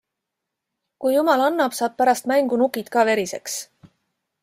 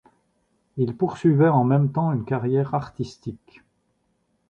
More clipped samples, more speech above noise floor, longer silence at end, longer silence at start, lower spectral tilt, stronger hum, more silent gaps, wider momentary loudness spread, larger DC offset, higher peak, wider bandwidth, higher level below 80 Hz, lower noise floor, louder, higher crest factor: neither; first, 62 dB vs 48 dB; second, 0.8 s vs 1.15 s; first, 1 s vs 0.75 s; second, -3 dB/octave vs -9.5 dB/octave; neither; neither; second, 9 LU vs 16 LU; neither; about the same, -4 dBFS vs -6 dBFS; first, 16 kHz vs 8 kHz; second, -72 dBFS vs -58 dBFS; first, -82 dBFS vs -70 dBFS; about the same, -21 LUFS vs -22 LUFS; about the same, 18 dB vs 18 dB